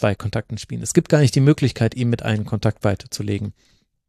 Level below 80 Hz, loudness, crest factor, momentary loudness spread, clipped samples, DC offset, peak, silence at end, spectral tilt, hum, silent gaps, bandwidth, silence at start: -48 dBFS; -20 LUFS; 20 dB; 11 LU; under 0.1%; under 0.1%; 0 dBFS; 0.55 s; -6 dB/octave; none; none; 13.5 kHz; 0 s